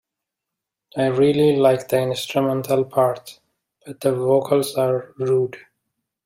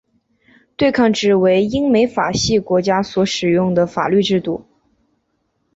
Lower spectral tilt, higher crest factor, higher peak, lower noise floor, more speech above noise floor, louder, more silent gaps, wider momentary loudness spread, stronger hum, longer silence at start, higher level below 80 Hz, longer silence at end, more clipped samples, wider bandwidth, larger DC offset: about the same, -6 dB/octave vs -5 dB/octave; about the same, 16 dB vs 14 dB; about the same, -4 dBFS vs -2 dBFS; first, -84 dBFS vs -67 dBFS; first, 65 dB vs 52 dB; second, -20 LUFS vs -16 LUFS; neither; first, 8 LU vs 4 LU; neither; first, 0.95 s vs 0.8 s; second, -62 dBFS vs -46 dBFS; second, 0.7 s vs 1.15 s; neither; first, 16 kHz vs 8 kHz; neither